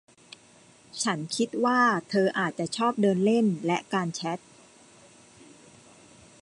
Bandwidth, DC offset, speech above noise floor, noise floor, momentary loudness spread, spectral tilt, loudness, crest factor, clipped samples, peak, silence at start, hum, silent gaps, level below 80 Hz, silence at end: 11.5 kHz; under 0.1%; 30 dB; -56 dBFS; 9 LU; -5 dB/octave; -26 LUFS; 18 dB; under 0.1%; -12 dBFS; 0.95 s; none; none; -74 dBFS; 2.05 s